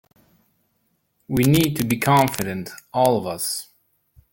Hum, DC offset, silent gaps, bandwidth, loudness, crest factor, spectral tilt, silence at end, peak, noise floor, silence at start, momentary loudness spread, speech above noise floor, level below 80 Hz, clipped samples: none; under 0.1%; none; 17 kHz; -21 LUFS; 22 dB; -5 dB/octave; 0.7 s; 0 dBFS; -69 dBFS; 1.3 s; 11 LU; 49 dB; -50 dBFS; under 0.1%